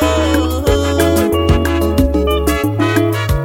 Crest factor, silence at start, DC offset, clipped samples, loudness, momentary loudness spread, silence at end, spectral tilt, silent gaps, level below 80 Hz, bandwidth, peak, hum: 12 dB; 0 s; under 0.1%; under 0.1%; -14 LUFS; 2 LU; 0 s; -6 dB/octave; none; -20 dBFS; 17 kHz; 0 dBFS; none